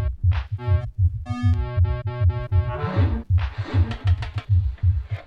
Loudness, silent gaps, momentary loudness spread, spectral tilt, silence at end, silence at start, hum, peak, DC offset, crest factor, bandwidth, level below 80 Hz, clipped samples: -23 LUFS; none; 3 LU; -9 dB/octave; 0 s; 0 s; none; -8 dBFS; under 0.1%; 12 dB; 5.4 kHz; -28 dBFS; under 0.1%